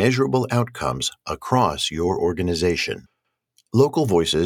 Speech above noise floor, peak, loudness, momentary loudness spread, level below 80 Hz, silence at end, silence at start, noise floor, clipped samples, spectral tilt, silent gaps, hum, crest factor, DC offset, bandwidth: 45 dB; -2 dBFS; -21 LUFS; 7 LU; -48 dBFS; 0 s; 0 s; -65 dBFS; under 0.1%; -5 dB/octave; none; none; 20 dB; under 0.1%; 17.5 kHz